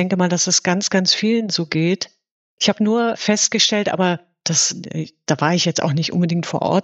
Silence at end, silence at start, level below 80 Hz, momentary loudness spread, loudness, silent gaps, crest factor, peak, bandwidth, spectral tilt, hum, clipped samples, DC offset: 0 s; 0 s; -66 dBFS; 7 LU; -18 LUFS; 2.31-2.58 s; 18 dB; -2 dBFS; 8.4 kHz; -3.5 dB/octave; none; under 0.1%; under 0.1%